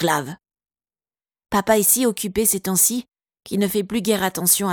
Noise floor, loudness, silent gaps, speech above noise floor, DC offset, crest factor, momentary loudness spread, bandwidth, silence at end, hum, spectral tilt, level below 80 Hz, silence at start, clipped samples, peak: under -90 dBFS; -19 LUFS; none; over 70 dB; under 0.1%; 20 dB; 8 LU; 19.5 kHz; 0 s; none; -3 dB/octave; -52 dBFS; 0 s; under 0.1%; -2 dBFS